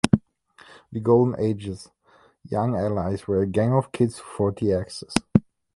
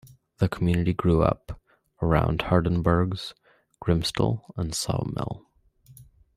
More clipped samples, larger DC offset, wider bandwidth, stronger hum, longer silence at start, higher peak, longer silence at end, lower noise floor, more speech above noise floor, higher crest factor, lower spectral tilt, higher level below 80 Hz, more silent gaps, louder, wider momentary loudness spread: neither; neither; second, 11.5 kHz vs 15.5 kHz; neither; second, 0.05 s vs 0.4 s; first, 0 dBFS vs -6 dBFS; about the same, 0.35 s vs 0.35 s; about the same, -54 dBFS vs -55 dBFS; about the same, 31 dB vs 31 dB; about the same, 24 dB vs 20 dB; about the same, -7 dB/octave vs -6.5 dB/octave; second, -48 dBFS vs -42 dBFS; neither; about the same, -24 LUFS vs -26 LUFS; about the same, 10 LU vs 12 LU